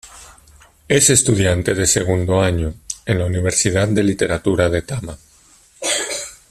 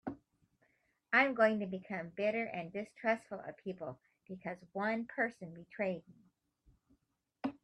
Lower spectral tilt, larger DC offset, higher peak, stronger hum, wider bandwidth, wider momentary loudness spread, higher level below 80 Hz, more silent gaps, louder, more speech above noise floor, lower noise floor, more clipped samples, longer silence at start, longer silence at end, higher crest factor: second, -4 dB/octave vs -6.5 dB/octave; neither; first, 0 dBFS vs -16 dBFS; neither; first, 14 kHz vs 10.5 kHz; second, 13 LU vs 17 LU; first, -40 dBFS vs -76 dBFS; neither; first, -17 LUFS vs -36 LUFS; second, 34 dB vs 42 dB; second, -50 dBFS vs -79 dBFS; neither; about the same, 0.05 s vs 0.05 s; about the same, 0.15 s vs 0.1 s; about the same, 18 dB vs 22 dB